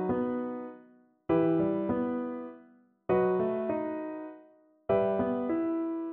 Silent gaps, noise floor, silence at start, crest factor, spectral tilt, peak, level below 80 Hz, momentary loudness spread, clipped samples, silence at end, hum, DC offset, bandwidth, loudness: none; -60 dBFS; 0 s; 16 dB; -11.5 dB/octave; -16 dBFS; -62 dBFS; 16 LU; under 0.1%; 0 s; none; under 0.1%; 3.8 kHz; -30 LUFS